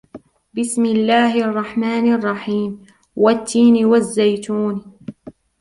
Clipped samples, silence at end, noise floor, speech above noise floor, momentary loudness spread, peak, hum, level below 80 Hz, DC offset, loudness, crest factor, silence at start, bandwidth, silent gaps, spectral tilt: under 0.1%; 0.3 s; -42 dBFS; 26 dB; 17 LU; -2 dBFS; none; -58 dBFS; under 0.1%; -17 LUFS; 14 dB; 0.15 s; 11.5 kHz; none; -5 dB/octave